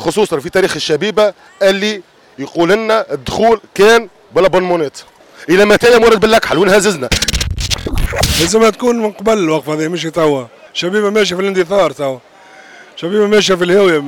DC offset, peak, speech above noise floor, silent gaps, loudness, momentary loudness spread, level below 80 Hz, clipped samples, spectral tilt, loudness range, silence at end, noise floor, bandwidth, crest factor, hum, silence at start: under 0.1%; 0 dBFS; 27 dB; none; -12 LUFS; 10 LU; -30 dBFS; under 0.1%; -4 dB/octave; 4 LU; 0 s; -39 dBFS; 18 kHz; 12 dB; none; 0 s